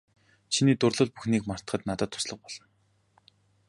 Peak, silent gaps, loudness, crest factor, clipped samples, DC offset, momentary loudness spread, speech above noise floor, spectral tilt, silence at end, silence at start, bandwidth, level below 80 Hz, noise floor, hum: -10 dBFS; none; -28 LUFS; 20 dB; under 0.1%; under 0.1%; 15 LU; 41 dB; -5 dB/octave; 1.1 s; 0.5 s; 11.5 kHz; -58 dBFS; -69 dBFS; none